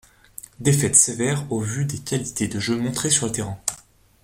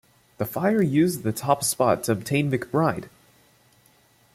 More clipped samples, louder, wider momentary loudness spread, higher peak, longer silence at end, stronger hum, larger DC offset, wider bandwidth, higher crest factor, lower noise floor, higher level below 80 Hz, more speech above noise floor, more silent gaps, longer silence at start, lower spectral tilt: neither; about the same, -21 LUFS vs -23 LUFS; first, 17 LU vs 7 LU; first, -2 dBFS vs -6 dBFS; second, 0.45 s vs 1.25 s; neither; neither; about the same, 16.5 kHz vs 16.5 kHz; about the same, 22 dB vs 20 dB; second, -49 dBFS vs -59 dBFS; first, -52 dBFS vs -60 dBFS; second, 27 dB vs 37 dB; neither; first, 0.6 s vs 0.4 s; second, -3.5 dB/octave vs -5.5 dB/octave